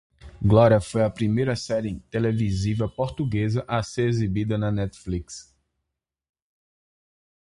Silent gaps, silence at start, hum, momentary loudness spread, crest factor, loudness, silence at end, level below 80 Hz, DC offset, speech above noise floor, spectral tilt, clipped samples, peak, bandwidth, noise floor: none; 0.25 s; none; 11 LU; 20 dB; -24 LUFS; 2.05 s; -44 dBFS; under 0.1%; 61 dB; -7 dB/octave; under 0.1%; -6 dBFS; 11 kHz; -83 dBFS